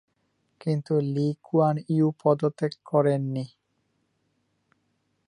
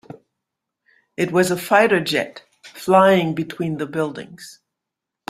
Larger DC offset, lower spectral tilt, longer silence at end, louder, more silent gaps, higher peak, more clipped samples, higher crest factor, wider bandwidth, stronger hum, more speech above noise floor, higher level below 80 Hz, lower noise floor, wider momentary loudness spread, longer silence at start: neither; first, -9 dB/octave vs -5 dB/octave; first, 1.8 s vs 0.75 s; second, -26 LUFS vs -18 LUFS; neither; second, -8 dBFS vs 0 dBFS; neither; about the same, 18 dB vs 20 dB; second, 10 kHz vs 16 kHz; neither; second, 49 dB vs 65 dB; second, -74 dBFS vs -62 dBFS; second, -73 dBFS vs -83 dBFS; second, 9 LU vs 19 LU; second, 0.65 s vs 1.2 s